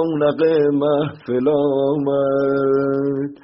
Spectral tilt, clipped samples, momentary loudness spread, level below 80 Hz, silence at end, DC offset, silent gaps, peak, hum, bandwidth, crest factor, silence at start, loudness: -6.5 dB/octave; under 0.1%; 5 LU; -58 dBFS; 0.1 s; under 0.1%; none; -6 dBFS; none; 5.8 kHz; 12 dB; 0 s; -18 LUFS